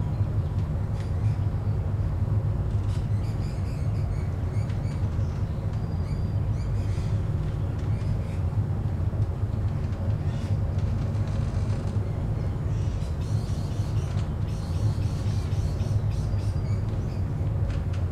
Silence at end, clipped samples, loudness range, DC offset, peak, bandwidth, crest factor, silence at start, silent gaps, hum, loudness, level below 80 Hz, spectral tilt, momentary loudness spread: 0 s; under 0.1%; 1 LU; under 0.1%; -14 dBFS; 9.8 kHz; 12 dB; 0 s; none; none; -28 LUFS; -34 dBFS; -8 dB/octave; 2 LU